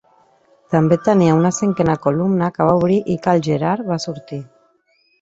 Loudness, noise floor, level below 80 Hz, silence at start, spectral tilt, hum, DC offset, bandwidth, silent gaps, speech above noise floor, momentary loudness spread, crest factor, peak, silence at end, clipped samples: -17 LUFS; -61 dBFS; -52 dBFS; 0.7 s; -7 dB/octave; none; under 0.1%; 8 kHz; none; 44 dB; 10 LU; 16 dB; -2 dBFS; 0.75 s; under 0.1%